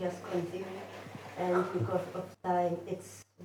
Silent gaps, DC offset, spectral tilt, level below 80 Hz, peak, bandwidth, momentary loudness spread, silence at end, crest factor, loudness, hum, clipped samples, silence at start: none; under 0.1%; -6.5 dB/octave; -82 dBFS; -18 dBFS; 19 kHz; 14 LU; 0 s; 18 dB; -35 LUFS; none; under 0.1%; 0 s